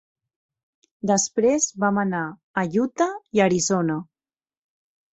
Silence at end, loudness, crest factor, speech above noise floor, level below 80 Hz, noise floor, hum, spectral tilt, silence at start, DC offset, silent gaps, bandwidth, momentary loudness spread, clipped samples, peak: 1.1 s; -22 LUFS; 20 dB; over 68 dB; -64 dBFS; under -90 dBFS; none; -4.5 dB/octave; 1.05 s; under 0.1%; 2.43-2.54 s; 8.2 kHz; 9 LU; under 0.1%; -4 dBFS